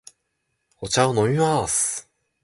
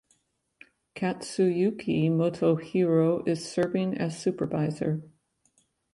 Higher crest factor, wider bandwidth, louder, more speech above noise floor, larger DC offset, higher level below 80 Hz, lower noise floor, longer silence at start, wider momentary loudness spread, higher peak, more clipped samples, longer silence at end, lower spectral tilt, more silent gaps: about the same, 18 dB vs 16 dB; about the same, 12 kHz vs 11.5 kHz; first, -21 LUFS vs -27 LUFS; first, 54 dB vs 46 dB; neither; first, -52 dBFS vs -66 dBFS; about the same, -75 dBFS vs -72 dBFS; second, 0.8 s vs 0.95 s; first, 10 LU vs 7 LU; first, -6 dBFS vs -12 dBFS; neither; second, 0.4 s vs 0.85 s; second, -4 dB/octave vs -7 dB/octave; neither